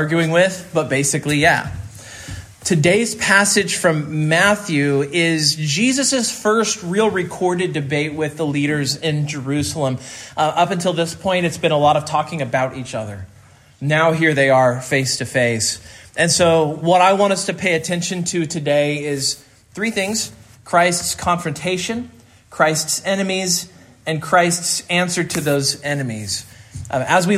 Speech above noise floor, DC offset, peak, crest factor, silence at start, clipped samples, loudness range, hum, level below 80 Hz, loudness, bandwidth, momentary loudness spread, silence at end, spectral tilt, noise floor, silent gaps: 28 dB; under 0.1%; 0 dBFS; 18 dB; 0 s; under 0.1%; 4 LU; none; -52 dBFS; -18 LUFS; 16 kHz; 12 LU; 0 s; -4 dB/octave; -46 dBFS; none